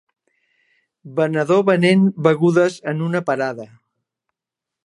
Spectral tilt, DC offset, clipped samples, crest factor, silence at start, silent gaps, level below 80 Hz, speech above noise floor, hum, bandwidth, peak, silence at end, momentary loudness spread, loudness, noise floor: -7 dB/octave; under 0.1%; under 0.1%; 18 dB; 1.05 s; none; -68 dBFS; 69 dB; none; 11 kHz; -2 dBFS; 1.2 s; 10 LU; -17 LUFS; -86 dBFS